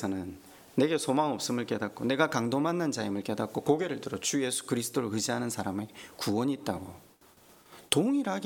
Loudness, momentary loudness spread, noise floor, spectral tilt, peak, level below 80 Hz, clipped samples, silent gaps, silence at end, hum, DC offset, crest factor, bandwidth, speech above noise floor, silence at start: -30 LUFS; 9 LU; -59 dBFS; -4.5 dB/octave; -6 dBFS; -68 dBFS; under 0.1%; none; 0 s; none; under 0.1%; 24 dB; 18.5 kHz; 28 dB; 0 s